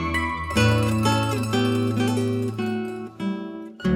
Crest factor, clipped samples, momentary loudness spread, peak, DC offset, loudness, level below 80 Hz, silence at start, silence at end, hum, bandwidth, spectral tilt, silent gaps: 16 dB; under 0.1%; 10 LU; -8 dBFS; under 0.1%; -23 LUFS; -42 dBFS; 0 s; 0 s; none; 16 kHz; -6 dB/octave; none